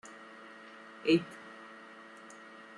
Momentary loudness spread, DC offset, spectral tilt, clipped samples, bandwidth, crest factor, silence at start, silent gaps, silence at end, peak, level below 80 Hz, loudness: 21 LU; under 0.1%; -5.5 dB/octave; under 0.1%; 10.5 kHz; 22 dB; 0.05 s; none; 0 s; -16 dBFS; -78 dBFS; -31 LUFS